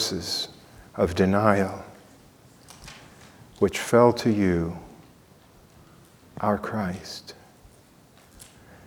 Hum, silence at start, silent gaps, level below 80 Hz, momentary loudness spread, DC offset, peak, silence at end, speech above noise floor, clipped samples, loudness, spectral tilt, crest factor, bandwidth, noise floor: none; 0 s; none; -52 dBFS; 25 LU; under 0.1%; -2 dBFS; 0.45 s; 31 dB; under 0.1%; -24 LUFS; -5.5 dB/octave; 24 dB; 19.5 kHz; -54 dBFS